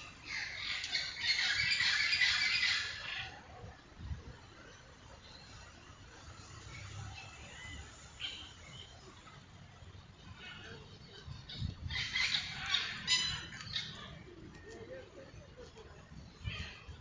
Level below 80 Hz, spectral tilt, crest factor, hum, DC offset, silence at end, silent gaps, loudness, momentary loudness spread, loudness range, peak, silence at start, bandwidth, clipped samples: -56 dBFS; -1.5 dB/octave; 24 dB; none; under 0.1%; 0 s; none; -34 LUFS; 25 LU; 19 LU; -18 dBFS; 0 s; 7.8 kHz; under 0.1%